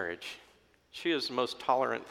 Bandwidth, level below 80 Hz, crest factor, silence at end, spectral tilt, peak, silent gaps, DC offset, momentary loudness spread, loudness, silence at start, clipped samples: 16 kHz; -74 dBFS; 20 dB; 0 s; -3.5 dB/octave; -14 dBFS; none; under 0.1%; 16 LU; -32 LUFS; 0 s; under 0.1%